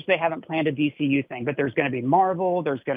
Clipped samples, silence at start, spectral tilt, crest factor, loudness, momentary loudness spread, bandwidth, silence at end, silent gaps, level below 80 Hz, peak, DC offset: under 0.1%; 0.05 s; -9.5 dB/octave; 16 dB; -24 LUFS; 5 LU; 3.8 kHz; 0 s; none; -68 dBFS; -6 dBFS; under 0.1%